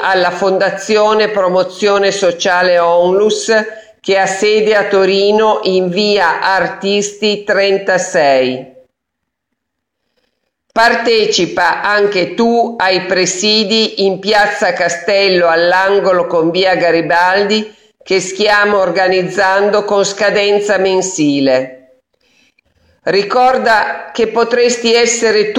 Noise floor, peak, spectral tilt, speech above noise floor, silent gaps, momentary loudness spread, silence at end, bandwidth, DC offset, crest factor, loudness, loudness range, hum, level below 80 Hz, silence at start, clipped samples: -75 dBFS; 0 dBFS; -3 dB/octave; 63 dB; none; 5 LU; 0 s; 11 kHz; under 0.1%; 12 dB; -12 LUFS; 4 LU; none; -54 dBFS; 0 s; under 0.1%